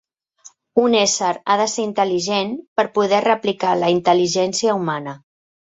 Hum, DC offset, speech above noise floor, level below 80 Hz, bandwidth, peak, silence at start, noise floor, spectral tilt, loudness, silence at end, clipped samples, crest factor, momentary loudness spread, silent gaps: none; under 0.1%; 31 dB; -64 dBFS; 8.2 kHz; -2 dBFS; 0.45 s; -49 dBFS; -3.5 dB/octave; -18 LUFS; 0.6 s; under 0.1%; 18 dB; 6 LU; 2.68-2.76 s